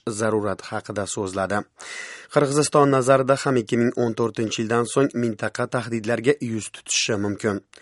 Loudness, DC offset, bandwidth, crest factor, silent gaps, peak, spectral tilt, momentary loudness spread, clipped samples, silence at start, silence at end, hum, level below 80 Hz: -22 LUFS; under 0.1%; 11.5 kHz; 20 dB; none; -2 dBFS; -4.5 dB/octave; 11 LU; under 0.1%; 0.05 s; 0.2 s; none; -64 dBFS